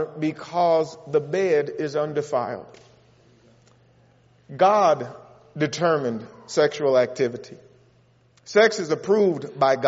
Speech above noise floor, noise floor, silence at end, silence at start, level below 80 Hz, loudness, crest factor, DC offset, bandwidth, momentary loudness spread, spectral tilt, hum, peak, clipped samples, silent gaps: 37 dB; -59 dBFS; 0 s; 0 s; -70 dBFS; -22 LUFS; 20 dB; under 0.1%; 8 kHz; 11 LU; -4 dB/octave; none; -4 dBFS; under 0.1%; none